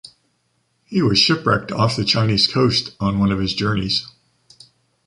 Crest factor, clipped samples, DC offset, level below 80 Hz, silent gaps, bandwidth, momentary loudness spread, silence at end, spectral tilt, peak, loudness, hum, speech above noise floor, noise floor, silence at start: 18 dB; under 0.1%; under 0.1%; -44 dBFS; none; 11.5 kHz; 7 LU; 1 s; -5 dB/octave; -2 dBFS; -18 LUFS; none; 49 dB; -67 dBFS; 0.05 s